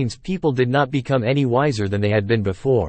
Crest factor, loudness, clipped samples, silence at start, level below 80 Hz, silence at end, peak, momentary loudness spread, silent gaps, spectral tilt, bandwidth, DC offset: 14 dB; -20 LUFS; under 0.1%; 0 s; -48 dBFS; 0 s; -4 dBFS; 3 LU; none; -7 dB/octave; 8.8 kHz; under 0.1%